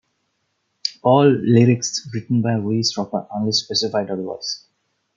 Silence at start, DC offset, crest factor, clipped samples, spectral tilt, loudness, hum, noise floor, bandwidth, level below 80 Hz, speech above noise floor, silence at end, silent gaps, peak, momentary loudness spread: 0.85 s; under 0.1%; 18 dB; under 0.1%; -5.5 dB/octave; -19 LUFS; none; -71 dBFS; 7.6 kHz; -64 dBFS; 53 dB; 0.6 s; none; -2 dBFS; 13 LU